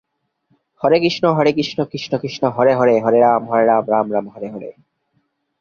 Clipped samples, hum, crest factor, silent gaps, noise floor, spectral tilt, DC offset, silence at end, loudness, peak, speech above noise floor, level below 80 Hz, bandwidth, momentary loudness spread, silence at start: under 0.1%; none; 16 dB; none; -67 dBFS; -6.5 dB/octave; under 0.1%; 0.9 s; -16 LUFS; -2 dBFS; 51 dB; -60 dBFS; 7 kHz; 15 LU; 0.8 s